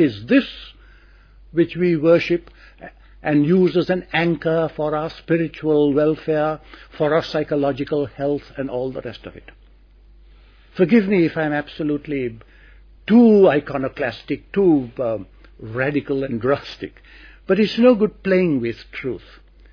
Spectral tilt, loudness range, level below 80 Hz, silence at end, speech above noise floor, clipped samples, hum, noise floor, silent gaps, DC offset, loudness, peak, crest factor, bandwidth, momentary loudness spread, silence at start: -8.5 dB/octave; 5 LU; -48 dBFS; 0.55 s; 30 dB; under 0.1%; none; -49 dBFS; none; under 0.1%; -19 LUFS; -2 dBFS; 16 dB; 5.4 kHz; 14 LU; 0 s